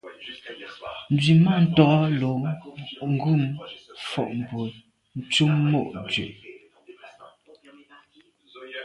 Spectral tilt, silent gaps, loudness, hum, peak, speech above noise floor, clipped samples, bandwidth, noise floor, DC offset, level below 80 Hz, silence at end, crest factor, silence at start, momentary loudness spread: -6.5 dB/octave; none; -23 LUFS; none; -2 dBFS; 37 dB; under 0.1%; 11 kHz; -59 dBFS; under 0.1%; -60 dBFS; 0 s; 22 dB; 0.05 s; 21 LU